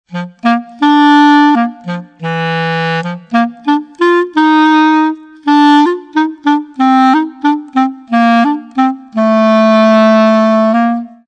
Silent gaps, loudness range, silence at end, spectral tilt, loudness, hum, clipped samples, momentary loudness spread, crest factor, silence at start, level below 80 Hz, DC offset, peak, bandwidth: none; 2 LU; 0.2 s; -6.5 dB/octave; -10 LUFS; none; 0.3%; 9 LU; 10 dB; 0.1 s; -66 dBFS; under 0.1%; 0 dBFS; 8.8 kHz